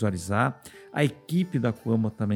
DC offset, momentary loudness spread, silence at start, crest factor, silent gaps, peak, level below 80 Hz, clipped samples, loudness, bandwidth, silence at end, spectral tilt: under 0.1%; 3 LU; 0 s; 20 dB; none; -6 dBFS; -60 dBFS; under 0.1%; -27 LUFS; 17.5 kHz; 0 s; -7 dB/octave